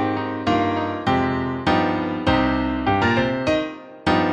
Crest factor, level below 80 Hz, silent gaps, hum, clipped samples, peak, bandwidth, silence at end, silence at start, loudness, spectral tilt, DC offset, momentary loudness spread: 16 dB; -40 dBFS; none; none; under 0.1%; -6 dBFS; 9 kHz; 0 s; 0 s; -21 LUFS; -6.5 dB/octave; under 0.1%; 5 LU